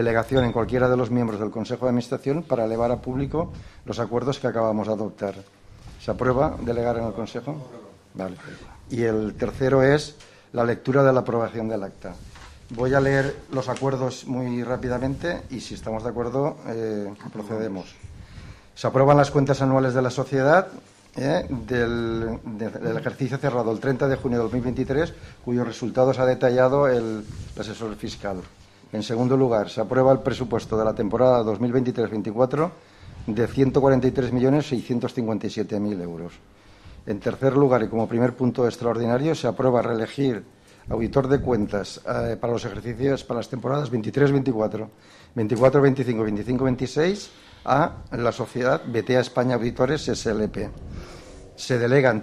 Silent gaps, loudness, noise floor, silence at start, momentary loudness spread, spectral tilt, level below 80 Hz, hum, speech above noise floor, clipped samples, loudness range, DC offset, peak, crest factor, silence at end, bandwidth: none; -23 LUFS; -46 dBFS; 0 s; 15 LU; -7 dB/octave; -46 dBFS; none; 23 dB; under 0.1%; 5 LU; under 0.1%; -4 dBFS; 20 dB; 0 s; 12.5 kHz